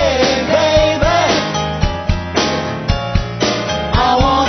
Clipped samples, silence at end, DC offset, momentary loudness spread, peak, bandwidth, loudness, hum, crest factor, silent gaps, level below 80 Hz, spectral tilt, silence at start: under 0.1%; 0 s; under 0.1%; 7 LU; 0 dBFS; 6.4 kHz; -15 LUFS; none; 14 dB; none; -24 dBFS; -4.5 dB/octave; 0 s